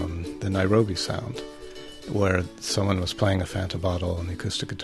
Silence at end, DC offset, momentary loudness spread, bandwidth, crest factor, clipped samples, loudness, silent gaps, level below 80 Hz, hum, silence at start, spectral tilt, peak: 0 s; under 0.1%; 14 LU; 12.5 kHz; 20 dB; under 0.1%; -26 LUFS; none; -44 dBFS; none; 0 s; -5.5 dB/octave; -6 dBFS